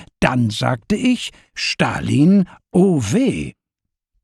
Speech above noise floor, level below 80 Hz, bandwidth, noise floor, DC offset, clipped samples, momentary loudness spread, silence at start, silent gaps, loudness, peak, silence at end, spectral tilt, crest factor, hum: 64 dB; -44 dBFS; 12.5 kHz; -81 dBFS; under 0.1%; under 0.1%; 9 LU; 0 s; none; -18 LUFS; -2 dBFS; 0.7 s; -6 dB/octave; 16 dB; none